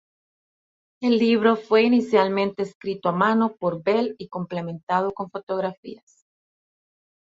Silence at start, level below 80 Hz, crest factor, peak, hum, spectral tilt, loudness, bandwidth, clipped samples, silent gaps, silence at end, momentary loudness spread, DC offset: 1 s; -68 dBFS; 20 dB; -4 dBFS; none; -7 dB/octave; -22 LUFS; 7.6 kHz; under 0.1%; 2.75-2.81 s, 4.83-4.87 s, 5.43-5.47 s, 5.77-5.83 s; 1.35 s; 12 LU; under 0.1%